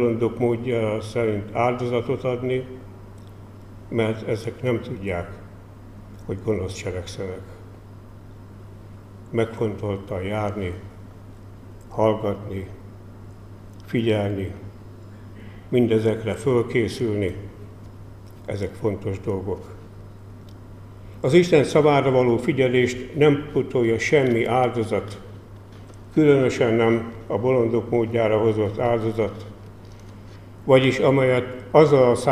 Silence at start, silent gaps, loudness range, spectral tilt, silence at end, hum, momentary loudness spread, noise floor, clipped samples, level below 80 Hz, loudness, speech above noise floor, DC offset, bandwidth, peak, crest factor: 0 s; none; 11 LU; -7 dB/octave; 0 s; none; 25 LU; -42 dBFS; under 0.1%; -48 dBFS; -22 LUFS; 21 dB; 0.1%; 13.5 kHz; -2 dBFS; 22 dB